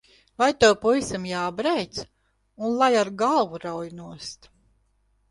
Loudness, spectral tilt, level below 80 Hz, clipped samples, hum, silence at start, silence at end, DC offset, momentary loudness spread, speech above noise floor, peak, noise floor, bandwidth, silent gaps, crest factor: -23 LUFS; -4 dB/octave; -56 dBFS; under 0.1%; none; 0.4 s; 0.95 s; under 0.1%; 19 LU; 43 dB; -4 dBFS; -67 dBFS; 11.5 kHz; none; 20 dB